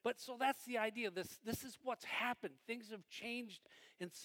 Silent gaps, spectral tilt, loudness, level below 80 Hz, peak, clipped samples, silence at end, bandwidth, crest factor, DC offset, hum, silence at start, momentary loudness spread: none; -3.5 dB/octave; -44 LUFS; -78 dBFS; -24 dBFS; under 0.1%; 0 s; 17.5 kHz; 20 dB; under 0.1%; none; 0.05 s; 12 LU